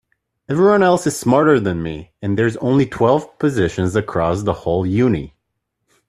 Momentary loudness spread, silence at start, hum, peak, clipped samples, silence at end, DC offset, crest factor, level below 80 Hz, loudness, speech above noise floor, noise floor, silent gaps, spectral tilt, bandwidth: 10 LU; 0.5 s; none; -2 dBFS; under 0.1%; 0.8 s; under 0.1%; 16 dB; -46 dBFS; -17 LUFS; 58 dB; -74 dBFS; none; -6.5 dB/octave; 13.5 kHz